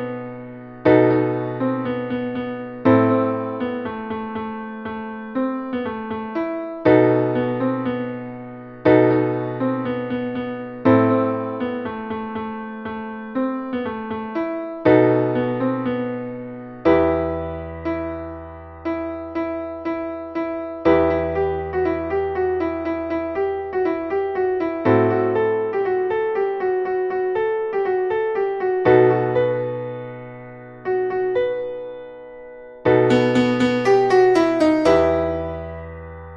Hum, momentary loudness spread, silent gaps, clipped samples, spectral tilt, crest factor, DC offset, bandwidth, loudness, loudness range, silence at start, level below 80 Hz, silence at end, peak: none; 15 LU; none; under 0.1%; -8 dB/octave; 18 dB; under 0.1%; 8.4 kHz; -21 LUFS; 7 LU; 0 s; -48 dBFS; 0 s; -2 dBFS